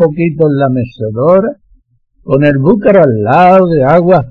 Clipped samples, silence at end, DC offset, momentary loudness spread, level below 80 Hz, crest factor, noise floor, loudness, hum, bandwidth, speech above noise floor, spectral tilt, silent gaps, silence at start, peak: 0.4%; 0 s; under 0.1%; 8 LU; -40 dBFS; 8 dB; -50 dBFS; -9 LUFS; none; 5.8 kHz; 42 dB; -10 dB/octave; none; 0 s; 0 dBFS